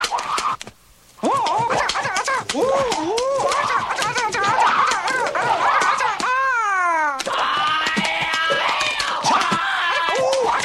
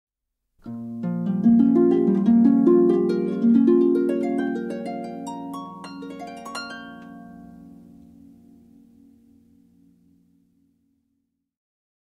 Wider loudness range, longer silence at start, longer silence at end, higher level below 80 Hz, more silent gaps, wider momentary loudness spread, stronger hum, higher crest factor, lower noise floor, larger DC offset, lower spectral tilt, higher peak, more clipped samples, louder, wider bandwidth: second, 2 LU vs 21 LU; second, 0 s vs 0.65 s; second, 0 s vs 4.35 s; first, -54 dBFS vs -64 dBFS; neither; second, 4 LU vs 20 LU; neither; about the same, 14 dB vs 16 dB; second, -50 dBFS vs -79 dBFS; neither; second, -2 dB/octave vs -8.5 dB/octave; about the same, -6 dBFS vs -6 dBFS; neither; about the same, -19 LUFS vs -20 LUFS; first, 14.5 kHz vs 10 kHz